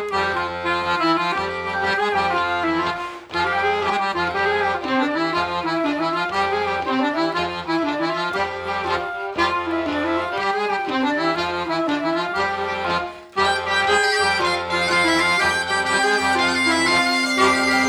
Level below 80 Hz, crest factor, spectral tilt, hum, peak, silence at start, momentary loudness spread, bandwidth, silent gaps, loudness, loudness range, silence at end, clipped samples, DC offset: -52 dBFS; 16 dB; -3.5 dB/octave; none; -4 dBFS; 0 s; 7 LU; 17.5 kHz; none; -20 LUFS; 5 LU; 0 s; under 0.1%; under 0.1%